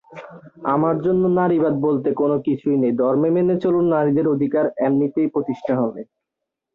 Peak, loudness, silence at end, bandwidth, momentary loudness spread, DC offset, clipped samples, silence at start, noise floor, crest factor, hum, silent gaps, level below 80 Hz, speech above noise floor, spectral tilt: -6 dBFS; -19 LUFS; 0.7 s; 4.1 kHz; 6 LU; under 0.1%; under 0.1%; 0.1 s; -82 dBFS; 12 dB; none; none; -60 dBFS; 63 dB; -11 dB/octave